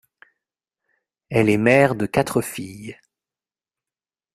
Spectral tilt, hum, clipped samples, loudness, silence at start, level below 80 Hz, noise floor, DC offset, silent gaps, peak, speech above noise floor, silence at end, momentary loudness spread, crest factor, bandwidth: -6 dB/octave; none; under 0.1%; -19 LUFS; 1.3 s; -56 dBFS; under -90 dBFS; under 0.1%; none; -2 dBFS; over 71 dB; 1.4 s; 20 LU; 22 dB; 15.5 kHz